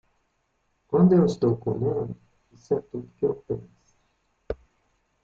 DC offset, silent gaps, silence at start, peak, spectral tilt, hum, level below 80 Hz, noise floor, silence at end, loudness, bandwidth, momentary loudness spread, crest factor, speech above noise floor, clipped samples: under 0.1%; none; 0.9 s; -8 dBFS; -9.5 dB/octave; none; -54 dBFS; -72 dBFS; 0.7 s; -25 LUFS; 7.4 kHz; 19 LU; 18 dB; 49 dB; under 0.1%